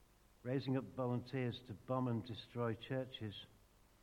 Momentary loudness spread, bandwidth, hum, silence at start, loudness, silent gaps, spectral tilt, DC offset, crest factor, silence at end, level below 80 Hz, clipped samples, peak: 11 LU; 13 kHz; none; 0.45 s; -43 LUFS; none; -8 dB/octave; under 0.1%; 18 dB; 0.55 s; -72 dBFS; under 0.1%; -26 dBFS